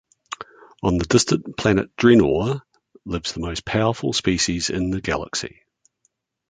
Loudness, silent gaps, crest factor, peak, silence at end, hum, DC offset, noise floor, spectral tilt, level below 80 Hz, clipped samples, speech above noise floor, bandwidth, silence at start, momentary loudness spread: -21 LUFS; none; 20 dB; -2 dBFS; 1 s; none; under 0.1%; -69 dBFS; -4.5 dB/octave; -42 dBFS; under 0.1%; 49 dB; 9.6 kHz; 0.3 s; 19 LU